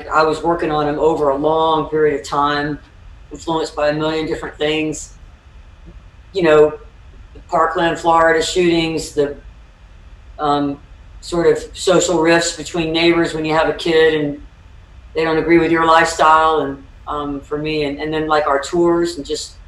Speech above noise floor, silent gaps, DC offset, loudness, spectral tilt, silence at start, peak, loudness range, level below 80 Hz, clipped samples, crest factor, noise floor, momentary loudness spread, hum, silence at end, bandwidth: 26 dB; none; under 0.1%; -16 LUFS; -4.5 dB/octave; 0 s; -2 dBFS; 5 LU; -40 dBFS; under 0.1%; 16 dB; -41 dBFS; 12 LU; none; 0.05 s; 12 kHz